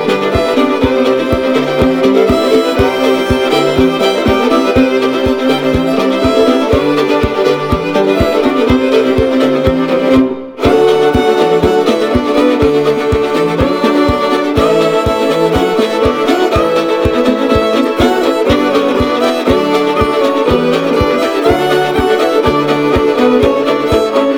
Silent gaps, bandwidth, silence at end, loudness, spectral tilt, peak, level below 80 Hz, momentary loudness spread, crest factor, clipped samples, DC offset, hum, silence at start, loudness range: none; 19.5 kHz; 0 s; -11 LUFS; -6 dB/octave; 0 dBFS; -28 dBFS; 2 LU; 10 dB; under 0.1%; under 0.1%; none; 0 s; 1 LU